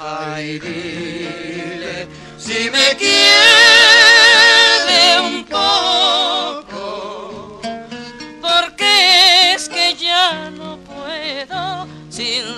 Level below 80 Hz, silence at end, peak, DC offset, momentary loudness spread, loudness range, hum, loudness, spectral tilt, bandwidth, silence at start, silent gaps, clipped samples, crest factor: -52 dBFS; 0 s; 0 dBFS; under 0.1%; 24 LU; 10 LU; none; -9 LUFS; -0.5 dB/octave; 15.5 kHz; 0 s; none; under 0.1%; 14 dB